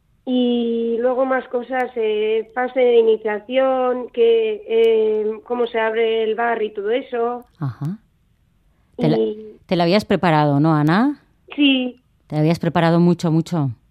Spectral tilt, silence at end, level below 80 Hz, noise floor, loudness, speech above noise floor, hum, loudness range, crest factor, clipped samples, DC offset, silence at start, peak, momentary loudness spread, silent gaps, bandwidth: -7.5 dB/octave; 0.15 s; -58 dBFS; -60 dBFS; -19 LUFS; 42 dB; none; 5 LU; 18 dB; under 0.1%; under 0.1%; 0.25 s; -2 dBFS; 9 LU; none; 11 kHz